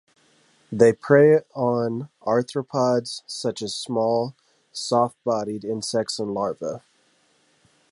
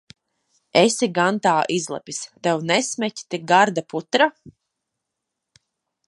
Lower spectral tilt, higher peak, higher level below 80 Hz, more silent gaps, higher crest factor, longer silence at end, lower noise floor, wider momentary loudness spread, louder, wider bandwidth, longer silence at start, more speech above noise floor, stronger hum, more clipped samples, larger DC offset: first, -5.5 dB/octave vs -3.5 dB/octave; about the same, -2 dBFS vs -2 dBFS; about the same, -66 dBFS vs -70 dBFS; neither; about the same, 20 dB vs 22 dB; second, 1.15 s vs 1.6 s; second, -63 dBFS vs -81 dBFS; first, 15 LU vs 11 LU; second, -23 LUFS vs -20 LUFS; about the same, 11.5 kHz vs 11.5 kHz; about the same, 0.7 s vs 0.75 s; second, 41 dB vs 61 dB; neither; neither; neither